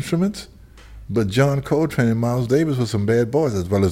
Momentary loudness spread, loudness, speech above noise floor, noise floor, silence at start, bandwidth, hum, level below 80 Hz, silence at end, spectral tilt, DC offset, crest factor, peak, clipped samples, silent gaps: 5 LU; -20 LUFS; 22 dB; -41 dBFS; 0 s; 16 kHz; none; -44 dBFS; 0 s; -7 dB/octave; under 0.1%; 16 dB; -4 dBFS; under 0.1%; none